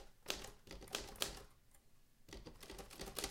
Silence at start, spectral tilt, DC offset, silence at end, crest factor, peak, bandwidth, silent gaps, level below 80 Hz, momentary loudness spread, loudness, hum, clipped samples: 0 s; -1.5 dB/octave; under 0.1%; 0 s; 34 dB; -16 dBFS; 17 kHz; none; -60 dBFS; 13 LU; -48 LUFS; none; under 0.1%